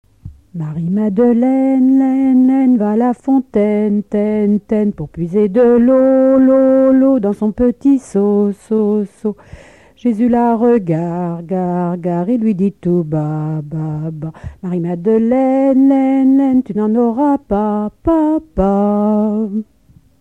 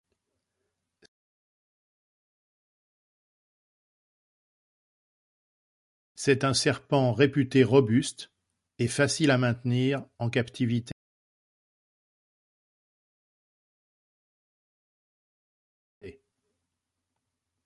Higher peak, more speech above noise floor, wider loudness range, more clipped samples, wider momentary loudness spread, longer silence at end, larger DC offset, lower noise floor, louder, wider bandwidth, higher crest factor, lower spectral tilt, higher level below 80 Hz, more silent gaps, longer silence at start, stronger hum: first, 0 dBFS vs -8 dBFS; second, 23 dB vs 60 dB; second, 5 LU vs 10 LU; neither; about the same, 11 LU vs 11 LU; second, 0.55 s vs 1.55 s; first, 0.2% vs under 0.1%; second, -36 dBFS vs -85 dBFS; first, -14 LUFS vs -26 LUFS; second, 8.4 kHz vs 11.5 kHz; second, 12 dB vs 24 dB; first, -10 dB/octave vs -5.5 dB/octave; first, -42 dBFS vs -64 dBFS; second, none vs 10.92-16.01 s; second, 0.25 s vs 6.2 s; neither